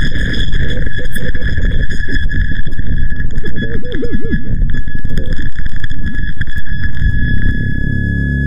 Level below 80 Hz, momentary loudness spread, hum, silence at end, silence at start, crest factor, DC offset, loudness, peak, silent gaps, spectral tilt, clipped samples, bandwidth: -16 dBFS; 6 LU; none; 0 s; 0 s; 6 dB; under 0.1%; -19 LUFS; 0 dBFS; none; -7 dB/octave; under 0.1%; 5.4 kHz